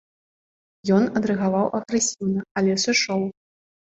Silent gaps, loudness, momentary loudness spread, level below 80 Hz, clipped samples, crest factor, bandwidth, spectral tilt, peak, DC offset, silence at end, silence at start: 2.51-2.55 s; -22 LUFS; 7 LU; -60 dBFS; under 0.1%; 16 dB; 8.2 kHz; -4 dB/octave; -8 dBFS; under 0.1%; 0.65 s; 0.85 s